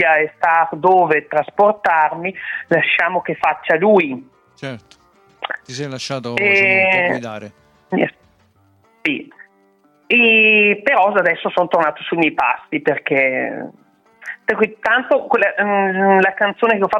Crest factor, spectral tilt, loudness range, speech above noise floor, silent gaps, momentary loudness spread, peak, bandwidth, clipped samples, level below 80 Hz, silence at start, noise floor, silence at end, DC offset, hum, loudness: 14 dB; -5.5 dB/octave; 5 LU; 40 dB; none; 15 LU; -4 dBFS; 10.5 kHz; under 0.1%; -64 dBFS; 0 s; -56 dBFS; 0 s; under 0.1%; none; -15 LUFS